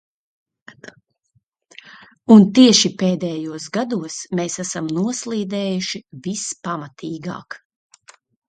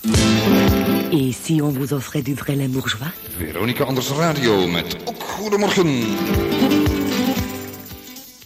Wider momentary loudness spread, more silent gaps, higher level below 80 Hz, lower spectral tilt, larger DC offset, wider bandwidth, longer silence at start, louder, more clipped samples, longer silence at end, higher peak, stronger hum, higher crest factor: first, 19 LU vs 12 LU; neither; second, -64 dBFS vs -36 dBFS; about the same, -4.5 dB/octave vs -5 dB/octave; neither; second, 9.4 kHz vs 16 kHz; first, 1.85 s vs 0 s; about the same, -18 LUFS vs -19 LUFS; neither; first, 0.9 s vs 0 s; first, 0 dBFS vs -4 dBFS; neither; about the same, 20 dB vs 16 dB